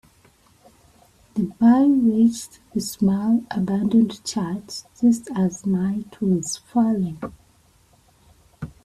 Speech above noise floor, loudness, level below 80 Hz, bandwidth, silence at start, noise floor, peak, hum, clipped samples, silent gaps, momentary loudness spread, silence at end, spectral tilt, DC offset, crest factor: 37 dB; -21 LUFS; -56 dBFS; 13 kHz; 1.35 s; -57 dBFS; -6 dBFS; none; under 0.1%; none; 14 LU; 0.15 s; -6 dB/octave; under 0.1%; 16 dB